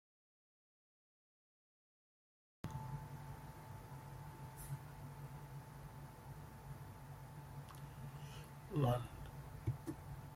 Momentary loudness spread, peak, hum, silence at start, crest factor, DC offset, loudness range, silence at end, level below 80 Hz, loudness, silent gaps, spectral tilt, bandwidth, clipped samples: 12 LU; -24 dBFS; none; 2.65 s; 24 dB; under 0.1%; 9 LU; 0 s; -62 dBFS; -49 LUFS; none; -7 dB/octave; 16.5 kHz; under 0.1%